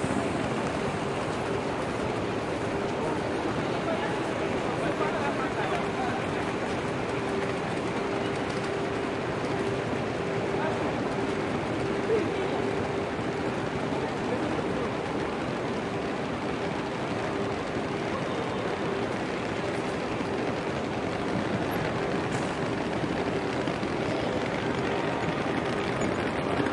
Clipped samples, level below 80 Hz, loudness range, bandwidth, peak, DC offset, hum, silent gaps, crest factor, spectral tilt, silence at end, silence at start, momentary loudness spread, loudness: under 0.1%; -52 dBFS; 2 LU; 12 kHz; -14 dBFS; under 0.1%; none; none; 16 dB; -6 dB/octave; 0 s; 0 s; 2 LU; -29 LUFS